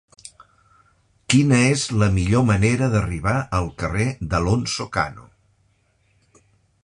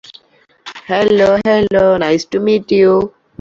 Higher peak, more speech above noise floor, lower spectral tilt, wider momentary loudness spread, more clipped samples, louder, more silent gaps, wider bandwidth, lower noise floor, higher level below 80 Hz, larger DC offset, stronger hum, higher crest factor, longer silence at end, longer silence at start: about the same, -2 dBFS vs -2 dBFS; first, 44 dB vs 40 dB; about the same, -5.5 dB/octave vs -6 dB/octave; about the same, 8 LU vs 10 LU; neither; second, -20 LUFS vs -12 LUFS; neither; first, 11 kHz vs 7.6 kHz; first, -63 dBFS vs -52 dBFS; first, -38 dBFS vs -46 dBFS; neither; neither; first, 20 dB vs 12 dB; first, 1.65 s vs 0.3 s; first, 0.25 s vs 0.1 s